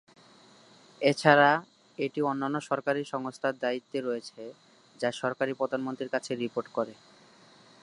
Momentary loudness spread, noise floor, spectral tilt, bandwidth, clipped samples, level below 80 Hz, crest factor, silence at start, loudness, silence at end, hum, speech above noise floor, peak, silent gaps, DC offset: 14 LU; -57 dBFS; -5 dB/octave; 11.5 kHz; under 0.1%; -80 dBFS; 26 dB; 1 s; -29 LUFS; 0.9 s; none; 28 dB; -4 dBFS; none; under 0.1%